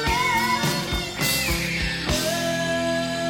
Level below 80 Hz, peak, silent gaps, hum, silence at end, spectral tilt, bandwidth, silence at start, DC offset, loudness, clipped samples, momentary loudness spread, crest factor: -36 dBFS; -10 dBFS; none; none; 0 s; -3.5 dB/octave; 17 kHz; 0 s; under 0.1%; -23 LUFS; under 0.1%; 4 LU; 14 dB